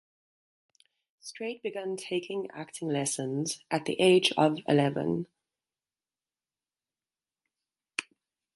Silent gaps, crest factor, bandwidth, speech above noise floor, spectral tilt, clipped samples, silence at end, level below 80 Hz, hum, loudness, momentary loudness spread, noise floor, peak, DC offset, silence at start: none; 22 dB; 11.5 kHz; over 61 dB; -4.5 dB/octave; under 0.1%; 0.55 s; -74 dBFS; none; -29 LUFS; 15 LU; under -90 dBFS; -10 dBFS; under 0.1%; 1.25 s